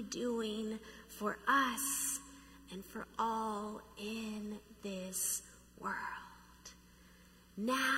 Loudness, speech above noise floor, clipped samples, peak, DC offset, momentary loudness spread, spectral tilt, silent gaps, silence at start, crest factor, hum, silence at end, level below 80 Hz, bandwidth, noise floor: -38 LUFS; 23 dB; under 0.1%; -18 dBFS; under 0.1%; 22 LU; -2.5 dB/octave; none; 0 s; 22 dB; none; 0 s; -66 dBFS; 16 kHz; -62 dBFS